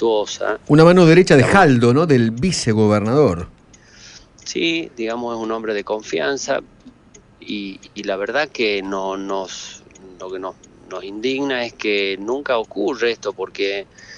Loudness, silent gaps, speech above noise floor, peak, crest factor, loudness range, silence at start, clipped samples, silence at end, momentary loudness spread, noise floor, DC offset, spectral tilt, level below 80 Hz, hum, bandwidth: -17 LUFS; none; 31 dB; 0 dBFS; 18 dB; 11 LU; 0 s; under 0.1%; 0 s; 19 LU; -48 dBFS; under 0.1%; -5.5 dB/octave; -48 dBFS; none; 11 kHz